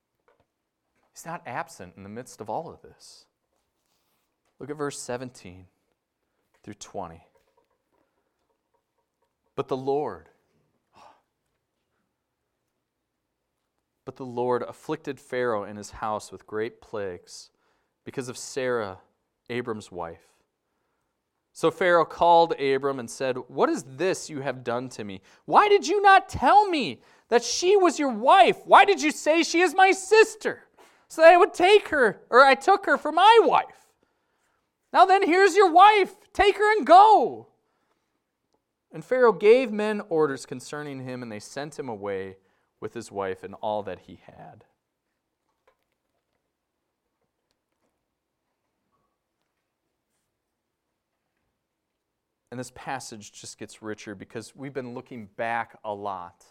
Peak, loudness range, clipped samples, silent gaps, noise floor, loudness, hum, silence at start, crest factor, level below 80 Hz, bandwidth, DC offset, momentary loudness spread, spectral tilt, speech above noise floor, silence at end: -2 dBFS; 20 LU; under 0.1%; none; -81 dBFS; -21 LUFS; none; 1.2 s; 22 dB; -62 dBFS; 14 kHz; under 0.1%; 23 LU; -3.5 dB/octave; 58 dB; 0.2 s